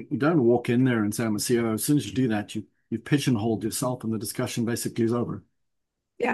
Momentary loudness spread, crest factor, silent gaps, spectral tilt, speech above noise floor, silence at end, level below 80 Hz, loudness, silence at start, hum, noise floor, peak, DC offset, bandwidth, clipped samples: 10 LU; 16 dB; none; -5.5 dB/octave; 55 dB; 0 s; -66 dBFS; -25 LUFS; 0 s; none; -80 dBFS; -10 dBFS; under 0.1%; 12.5 kHz; under 0.1%